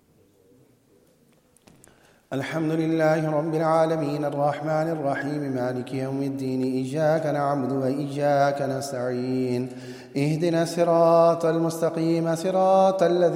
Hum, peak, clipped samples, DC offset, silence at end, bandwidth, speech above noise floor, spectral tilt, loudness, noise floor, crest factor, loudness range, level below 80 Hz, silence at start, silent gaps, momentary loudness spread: none; -8 dBFS; under 0.1%; under 0.1%; 0 s; 16 kHz; 37 dB; -7 dB/octave; -24 LUFS; -60 dBFS; 16 dB; 4 LU; -68 dBFS; 2.3 s; none; 9 LU